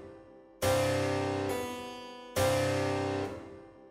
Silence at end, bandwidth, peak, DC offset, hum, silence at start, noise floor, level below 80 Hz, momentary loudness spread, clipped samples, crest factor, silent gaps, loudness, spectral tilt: 0 s; 16 kHz; -16 dBFS; under 0.1%; none; 0 s; -53 dBFS; -58 dBFS; 17 LU; under 0.1%; 16 dB; none; -32 LUFS; -5 dB/octave